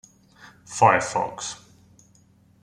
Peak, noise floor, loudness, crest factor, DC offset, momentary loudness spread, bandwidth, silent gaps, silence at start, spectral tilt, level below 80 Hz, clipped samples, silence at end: -4 dBFS; -57 dBFS; -22 LUFS; 22 dB; under 0.1%; 17 LU; 13 kHz; none; 0.45 s; -3.5 dB/octave; -62 dBFS; under 0.1%; 1.05 s